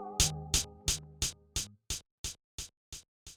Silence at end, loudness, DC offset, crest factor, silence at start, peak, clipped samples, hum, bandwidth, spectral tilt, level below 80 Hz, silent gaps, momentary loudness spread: 0 s; -34 LUFS; under 0.1%; 26 dB; 0 s; -12 dBFS; under 0.1%; none; over 20 kHz; -1.5 dB/octave; -46 dBFS; 2.11-2.24 s, 2.44-2.58 s, 2.77-2.92 s, 3.08-3.26 s; 16 LU